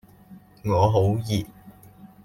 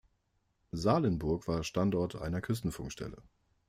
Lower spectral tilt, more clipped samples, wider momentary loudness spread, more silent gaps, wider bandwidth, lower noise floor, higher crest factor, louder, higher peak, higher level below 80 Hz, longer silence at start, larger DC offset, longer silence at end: about the same, -7.5 dB/octave vs -6.5 dB/octave; neither; about the same, 14 LU vs 13 LU; neither; about the same, 15.5 kHz vs 16 kHz; second, -49 dBFS vs -77 dBFS; about the same, 18 dB vs 20 dB; first, -23 LUFS vs -34 LUFS; first, -6 dBFS vs -14 dBFS; about the same, -52 dBFS vs -52 dBFS; second, 0.3 s vs 0.75 s; neither; second, 0.2 s vs 0.5 s